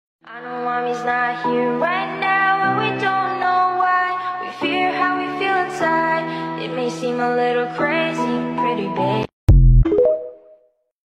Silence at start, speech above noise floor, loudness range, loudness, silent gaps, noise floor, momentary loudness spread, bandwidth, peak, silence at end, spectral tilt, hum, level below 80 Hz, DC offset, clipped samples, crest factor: 0.25 s; 34 dB; 2 LU; -19 LUFS; 9.33-9.47 s; -54 dBFS; 8 LU; 8.8 kHz; -4 dBFS; 0.75 s; -7 dB/octave; none; -26 dBFS; under 0.1%; under 0.1%; 16 dB